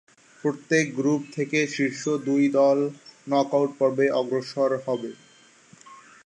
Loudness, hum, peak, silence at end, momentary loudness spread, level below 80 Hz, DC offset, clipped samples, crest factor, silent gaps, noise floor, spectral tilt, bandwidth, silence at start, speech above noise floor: -24 LUFS; none; -8 dBFS; 0.3 s; 9 LU; -78 dBFS; under 0.1%; under 0.1%; 16 dB; none; -54 dBFS; -5.5 dB/octave; 9.4 kHz; 0.45 s; 30 dB